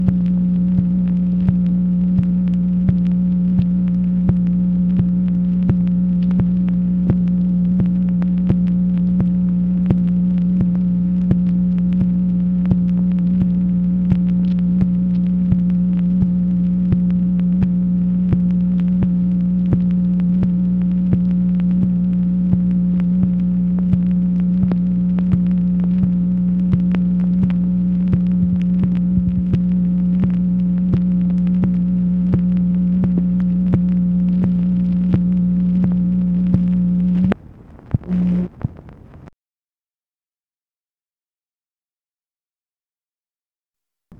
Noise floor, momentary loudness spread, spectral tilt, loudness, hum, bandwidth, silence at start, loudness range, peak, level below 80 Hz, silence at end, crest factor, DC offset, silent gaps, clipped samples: under -90 dBFS; 1 LU; -12 dB/octave; -17 LUFS; none; 3.1 kHz; 0 s; 0 LU; 0 dBFS; -34 dBFS; 4.9 s; 16 dB; under 0.1%; none; under 0.1%